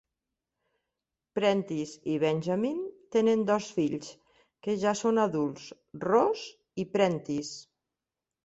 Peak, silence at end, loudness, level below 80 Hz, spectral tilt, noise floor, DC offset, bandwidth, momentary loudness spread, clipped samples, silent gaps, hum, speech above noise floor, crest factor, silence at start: -10 dBFS; 0.85 s; -29 LUFS; -70 dBFS; -5.5 dB/octave; -89 dBFS; under 0.1%; 8.2 kHz; 14 LU; under 0.1%; none; none; 61 dB; 20 dB; 1.35 s